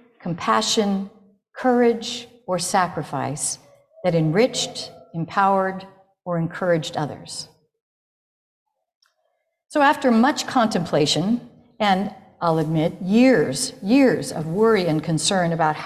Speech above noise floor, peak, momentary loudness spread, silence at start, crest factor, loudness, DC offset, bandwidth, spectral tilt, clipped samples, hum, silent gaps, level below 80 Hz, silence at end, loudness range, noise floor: 52 dB; -4 dBFS; 14 LU; 0.25 s; 16 dB; -21 LUFS; under 0.1%; 14.5 kHz; -4.5 dB/octave; under 0.1%; none; 7.82-8.66 s, 8.95-9.01 s; -60 dBFS; 0 s; 8 LU; -72 dBFS